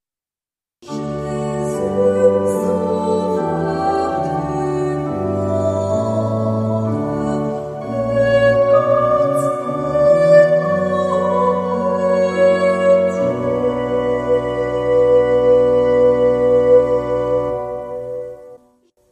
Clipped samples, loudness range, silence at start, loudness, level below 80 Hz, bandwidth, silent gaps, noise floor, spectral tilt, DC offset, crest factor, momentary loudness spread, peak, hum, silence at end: under 0.1%; 5 LU; 0.85 s; -16 LUFS; -44 dBFS; 12 kHz; none; under -90 dBFS; -7.5 dB/octave; under 0.1%; 16 dB; 9 LU; 0 dBFS; none; 0.55 s